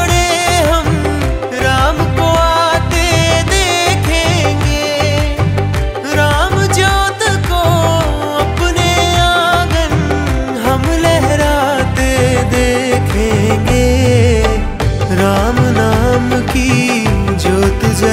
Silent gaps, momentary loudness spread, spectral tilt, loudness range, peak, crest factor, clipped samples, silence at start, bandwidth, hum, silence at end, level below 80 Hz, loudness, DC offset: none; 4 LU; -5 dB/octave; 1 LU; 0 dBFS; 12 dB; under 0.1%; 0 s; 16 kHz; none; 0 s; -20 dBFS; -12 LUFS; under 0.1%